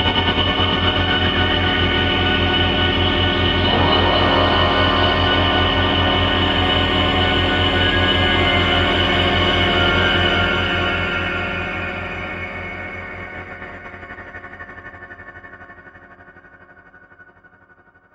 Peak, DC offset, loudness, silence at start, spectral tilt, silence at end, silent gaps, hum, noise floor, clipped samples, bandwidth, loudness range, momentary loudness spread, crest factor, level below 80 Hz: -2 dBFS; under 0.1%; -16 LUFS; 0 s; -6 dB/octave; 0.9 s; none; none; -51 dBFS; under 0.1%; 7.8 kHz; 17 LU; 19 LU; 16 dB; -32 dBFS